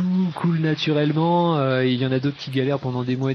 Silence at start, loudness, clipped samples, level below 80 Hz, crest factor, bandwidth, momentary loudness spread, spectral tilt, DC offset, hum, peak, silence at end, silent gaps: 0 s; -21 LUFS; under 0.1%; -62 dBFS; 14 dB; 6.4 kHz; 5 LU; -8 dB/octave; under 0.1%; none; -8 dBFS; 0 s; none